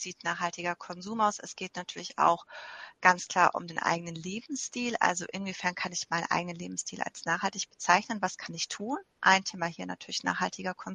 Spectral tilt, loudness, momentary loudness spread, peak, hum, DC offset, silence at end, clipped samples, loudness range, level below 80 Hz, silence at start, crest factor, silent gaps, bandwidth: -2.5 dB/octave; -30 LUFS; 13 LU; -4 dBFS; none; under 0.1%; 0 s; under 0.1%; 3 LU; -74 dBFS; 0 s; 26 dB; none; 10 kHz